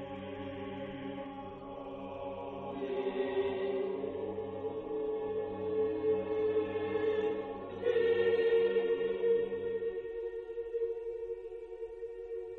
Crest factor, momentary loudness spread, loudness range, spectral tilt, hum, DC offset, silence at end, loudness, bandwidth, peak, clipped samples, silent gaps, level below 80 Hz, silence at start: 16 dB; 14 LU; 7 LU; -8 dB/octave; none; under 0.1%; 0 s; -35 LUFS; 4.4 kHz; -20 dBFS; under 0.1%; none; -64 dBFS; 0 s